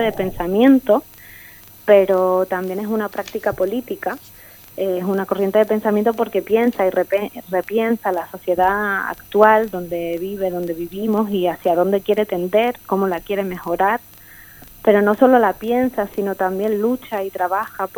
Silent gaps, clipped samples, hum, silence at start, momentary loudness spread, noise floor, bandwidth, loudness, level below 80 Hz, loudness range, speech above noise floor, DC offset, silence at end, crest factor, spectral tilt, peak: none; under 0.1%; none; 0 s; 11 LU; -42 dBFS; 19 kHz; -19 LUFS; -50 dBFS; 3 LU; 24 dB; under 0.1%; 0.1 s; 18 dB; -6.5 dB/octave; 0 dBFS